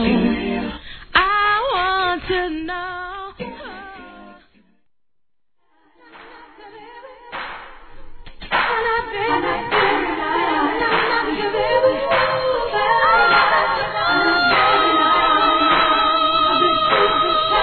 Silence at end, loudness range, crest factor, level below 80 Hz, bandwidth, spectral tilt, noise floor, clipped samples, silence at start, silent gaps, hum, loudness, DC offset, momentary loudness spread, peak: 0 s; 22 LU; 18 dB; -42 dBFS; 4.6 kHz; -6.5 dB/octave; -78 dBFS; under 0.1%; 0 s; none; none; -17 LUFS; 0.1%; 16 LU; 0 dBFS